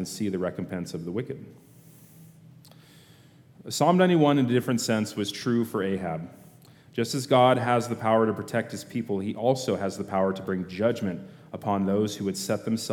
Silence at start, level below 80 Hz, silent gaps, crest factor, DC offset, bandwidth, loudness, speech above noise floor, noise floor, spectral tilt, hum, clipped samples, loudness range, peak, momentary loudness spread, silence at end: 0 s; -68 dBFS; none; 20 dB; under 0.1%; 18 kHz; -26 LUFS; 28 dB; -54 dBFS; -5.5 dB/octave; none; under 0.1%; 7 LU; -8 dBFS; 13 LU; 0 s